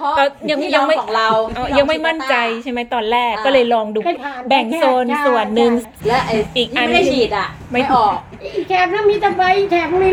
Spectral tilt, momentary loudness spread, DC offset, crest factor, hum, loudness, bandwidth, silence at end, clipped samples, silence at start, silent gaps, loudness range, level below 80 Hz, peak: -4.5 dB/octave; 6 LU; under 0.1%; 16 dB; none; -16 LUFS; 16.5 kHz; 0 s; under 0.1%; 0 s; none; 1 LU; -44 dBFS; 0 dBFS